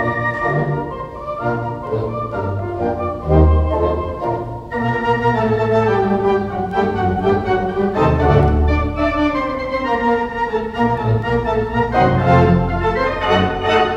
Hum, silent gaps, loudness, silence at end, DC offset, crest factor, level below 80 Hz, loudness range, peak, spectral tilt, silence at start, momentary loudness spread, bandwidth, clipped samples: none; none; -17 LUFS; 0 s; under 0.1%; 16 dB; -26 dBFS; 3 LU; 0 dBFS; -8 dB/octave; 0 s; 9 LU; 7.6 kHz; under 0.1%